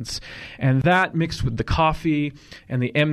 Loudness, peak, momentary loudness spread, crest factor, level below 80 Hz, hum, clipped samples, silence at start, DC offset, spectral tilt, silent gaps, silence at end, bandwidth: -22 LUFS; -8 dBFS; 12 LU; 14 dB; -38 dBFS; none; under 0.1%; 0 s; under 0.1%; -6 dB/octave; none; 0 s; 12.5 kHz